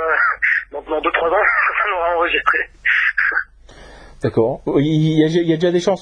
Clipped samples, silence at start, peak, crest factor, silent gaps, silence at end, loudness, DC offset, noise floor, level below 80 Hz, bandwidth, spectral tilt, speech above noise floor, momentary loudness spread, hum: under 0.1%; 0 s; 0 dBFS; 16 dB; none; 0 s; -16 LUFS; under 0.1%; -42 dBFS; -46 dBFS; 9.8 kHz; -6.5 dB/octave; 25 dB; 6 LU; none